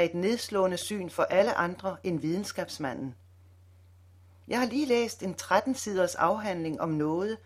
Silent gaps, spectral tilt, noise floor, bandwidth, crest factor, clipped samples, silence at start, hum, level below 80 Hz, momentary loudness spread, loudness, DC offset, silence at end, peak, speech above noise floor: none; -5 dB/octave; -56 dBFS; 16 kHz; 20 dB; under 0.1%; 0 s; none; -64 dBFS; 8 LU; -29 LUFS; under 0.1%; 0.1 s; -10 dBFS; 27 dB